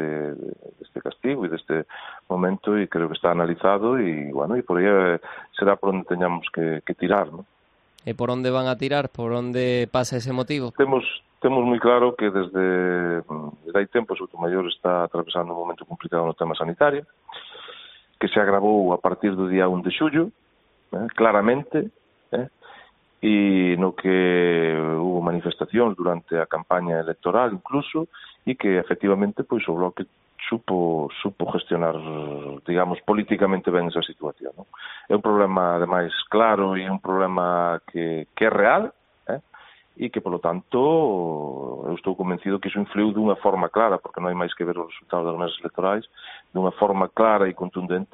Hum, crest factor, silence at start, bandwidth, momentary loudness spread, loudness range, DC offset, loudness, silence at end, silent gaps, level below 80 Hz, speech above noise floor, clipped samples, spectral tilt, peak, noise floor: none; 22 dB; 0 s; 8 kHz; 13 LU; 4 LU; under 0.1%; -23 LUFS; 0.1 s; none; -62 dBFS; 40 dB; under 0.1%; -4.5 dB/octave; -2 dBFS; -62 dBFS